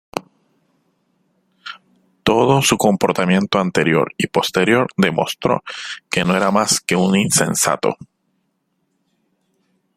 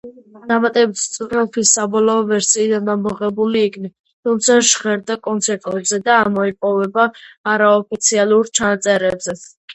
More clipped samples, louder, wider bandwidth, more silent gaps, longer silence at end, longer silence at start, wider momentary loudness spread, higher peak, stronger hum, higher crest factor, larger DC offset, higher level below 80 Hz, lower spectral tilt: neither; about the same, -17 LUFS vs -16 LUFS; first, 16 kHz vs 8.8 kHz; second, none vs 3.99-4.04 s, 4.13-4.23 s, 7.37-7.44 s, 9.57-9.68 s; first, 1.9 s vs 0 s; about the same, 0.15 s vs 0.05 s; first, 15 LU vs 8 LU; about the same, 0 dBFS vs 0 dBFS; neither; about the same, 18 dB vs 16 dB; neither; about the same, -54 dBFS vs -58 dBFS; first, -4 dB/octave vs -2.5 dB/octave